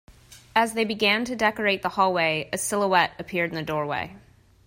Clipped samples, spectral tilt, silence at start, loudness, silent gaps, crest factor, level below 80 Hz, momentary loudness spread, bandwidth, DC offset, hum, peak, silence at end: under 0.1%; -3.5 dB/octave; 0.1 s; -24 LUFS; none; 20 dB; -58 dBFS; 6 LU; 16 kHz; under 0.1%; none; -6 dBFS; 0.5 s